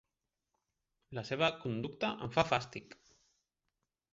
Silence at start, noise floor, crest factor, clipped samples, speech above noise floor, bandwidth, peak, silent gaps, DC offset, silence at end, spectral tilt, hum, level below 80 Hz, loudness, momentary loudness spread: 1.1 s; -88 dBFS; 26 dB; under 0.1%; 53 dB; 7.6 kHz; -14 dBFS; none; under 0.1%; 1.2 s; -3.5 dB/octave; none; -68 dBFS; -35 LUFS; 15 LU